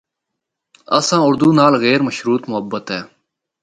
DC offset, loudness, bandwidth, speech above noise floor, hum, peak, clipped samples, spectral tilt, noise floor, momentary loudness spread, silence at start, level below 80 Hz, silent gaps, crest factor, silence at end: under 0.1%; -15 LUFS; 9.6 kHz; 64 dB; none; 0 dBFS; under 0.1%; -5 dB/octave; -79 dBFS; 12 LU; 0.9 s; -58 dBFS; none; 16 dB; 0.55 s